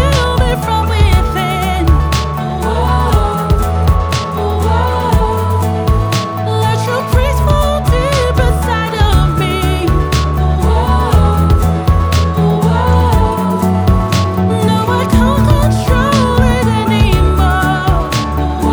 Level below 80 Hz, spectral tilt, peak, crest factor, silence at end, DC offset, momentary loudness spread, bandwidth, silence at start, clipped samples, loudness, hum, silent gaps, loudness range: -16 dBFS; -6.5 dB/octave; 0 dBFS; 10 dB; 0 s; under 0.1%; 4 LU; over 20 kHz; 0 s; under 0.1%; -13 LUFS; none; none; 2 LU